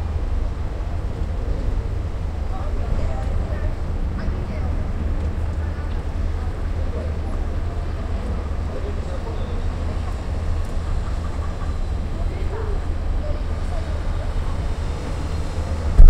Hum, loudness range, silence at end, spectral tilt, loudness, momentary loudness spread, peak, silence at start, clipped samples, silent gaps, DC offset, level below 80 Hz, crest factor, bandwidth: none; 1 LU; 0 s; -7.5 dB/octave; -27 LUFS; 2 LU; 0 dBFS; 0 s; under 0.1%; none; under 0.1%; -22 dBFS; 20 dB; 9 kHz